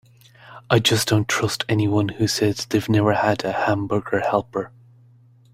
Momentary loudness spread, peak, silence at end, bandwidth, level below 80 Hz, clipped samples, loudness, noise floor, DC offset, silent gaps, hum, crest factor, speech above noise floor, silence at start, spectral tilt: 6 LU; -2 dBFS; 0.85 s; 16 kHz; -52 dBFS; under 0.1%; -21 LUFS; -52 dBFS; under 0.1%; none; none; 18 dB; 32 dB; 0.45 s; -5 dB/octave